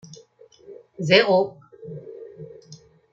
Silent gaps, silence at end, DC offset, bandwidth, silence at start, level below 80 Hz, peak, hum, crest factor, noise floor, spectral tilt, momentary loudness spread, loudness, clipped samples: none; 0.4 s; under 0.1%; 7.6 kHz; 0.7 s; -70 dBFS; -2 dBFS; none; 22 dB; -52 dBFS; -5 dB/octave; 27 LU; -19 LUFS; under 0.1%